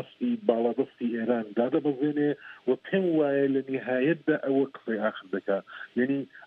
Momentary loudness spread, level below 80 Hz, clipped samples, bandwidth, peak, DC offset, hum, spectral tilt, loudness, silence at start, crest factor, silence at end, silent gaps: 6 LU; -82 dBFS; under 0.1%; 4.6 kHz; -8 dBFS; under 0.1%; none; -9.5 dB/octave; -28 LUFS; 0 s; 20 dB; 0 s; none